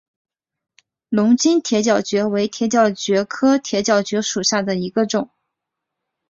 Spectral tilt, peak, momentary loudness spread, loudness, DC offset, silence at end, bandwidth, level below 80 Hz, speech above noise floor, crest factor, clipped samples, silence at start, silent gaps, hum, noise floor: -4 dB/octave; -2 dBFS; 6 LU; -18 LUFS; under 0.1%; 1.05 s; 7.8 kHz; -62 dBFS; 63 dB; 18 dB; under 0.1%; 1.1 s; none; none; -81 dBFS